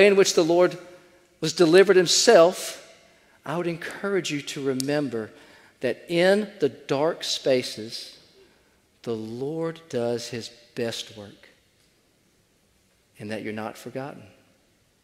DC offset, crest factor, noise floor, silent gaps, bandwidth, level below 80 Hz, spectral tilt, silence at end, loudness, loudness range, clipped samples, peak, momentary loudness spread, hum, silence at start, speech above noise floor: under 0.1%; 22 dB; -64 dBFS; none; 15.5 kHz; -70 dBFS; -3.5 dB/octave; 0.8 s; -23 LUFS; 17 LU; under 0.1%; -2 dBFS; 20 LU; none; 0 s; 41 dB